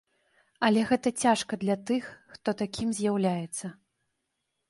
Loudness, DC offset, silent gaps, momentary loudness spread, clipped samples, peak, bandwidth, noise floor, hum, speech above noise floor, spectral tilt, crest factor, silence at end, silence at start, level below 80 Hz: -28 LUFS; under 0.1%; none; 11 LU; under 0.1%; -10 dBFS; 11.5 kHz; -81 dBFS; none; 53 dB; -5 dB/octave; 20 dB; 1 s; 0.6 s; -64 dBFS